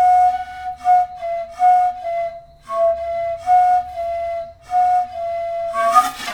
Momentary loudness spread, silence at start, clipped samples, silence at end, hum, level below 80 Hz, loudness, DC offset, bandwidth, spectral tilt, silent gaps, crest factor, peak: 11 LU; 0 s; under 0.1%; 0 s; none; -50 dBFS; -18 LUFS; under 0.1%; 17.5 kHz; -2.5 dB/octave; none; 16 dB; 0 dBFS